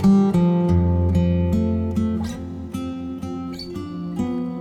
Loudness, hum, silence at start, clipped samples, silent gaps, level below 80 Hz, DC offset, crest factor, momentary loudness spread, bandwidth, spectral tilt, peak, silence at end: -22 LUFS; none; 0 s; under 0.1%; none; -36 dBFS; under 0.1%; 14 dB; 13 LU; 9.6 kHz; -9 dB/octave; -6 dBFS; 0 s